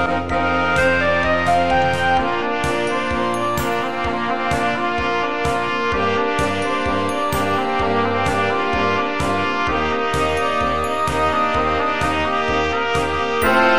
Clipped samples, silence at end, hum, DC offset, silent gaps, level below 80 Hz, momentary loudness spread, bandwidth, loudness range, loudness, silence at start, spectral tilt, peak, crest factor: under 0.1%; 0 s; none; 2%; none; -36 dBFS; 4 LU; 16 kHz; 2 LU; -19 LUFS; 0 s; -5 dB/octave; -2 dBFS; 16 dB